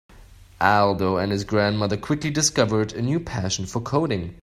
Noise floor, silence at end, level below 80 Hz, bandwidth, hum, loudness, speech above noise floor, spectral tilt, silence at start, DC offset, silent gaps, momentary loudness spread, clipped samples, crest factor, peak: -47 dBFS; 0.05 s; -48 dBFS; 15 kHz; none; -22 LUFS; 25 dB; -4.5 dB/octave; 0.15 s; under 0.1%; none; 6 LU; under 0.1%; 20 dB; -2 dBFS